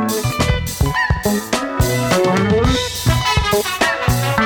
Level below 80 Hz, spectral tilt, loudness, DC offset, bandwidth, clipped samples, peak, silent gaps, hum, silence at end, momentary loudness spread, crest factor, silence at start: -26 dBFS; -4.5 dB/octave; -17 LUFS; under 0.1%; over 20 kHz; under 0.1%; -4 dBFS; none; none; 0 s; 4 LU; 12 dB; 0 s